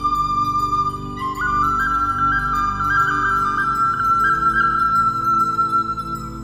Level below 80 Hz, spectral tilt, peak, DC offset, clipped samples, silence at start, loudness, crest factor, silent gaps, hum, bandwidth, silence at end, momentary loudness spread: -36 dBFS; -5 dB/octave; -6 dBFS; 0.2%; under 0.1%; 0 s; -18 LUFS; 12 dB; none; 50 Hz at -40 dBFS; 16 kHz; 0 s; 7 LU